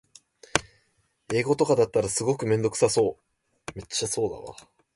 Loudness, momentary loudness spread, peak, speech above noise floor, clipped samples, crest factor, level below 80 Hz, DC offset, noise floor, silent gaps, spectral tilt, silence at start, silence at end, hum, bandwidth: -25 LUFS; 18 LU; -2 dBFS; 45 dB; under 0.1%; 26 dB; -56 dBFS; under 0.1%; -70 dBFS; none; -4 dB/octave; 0.55 s; 0.45 s; none; 11.5 kHz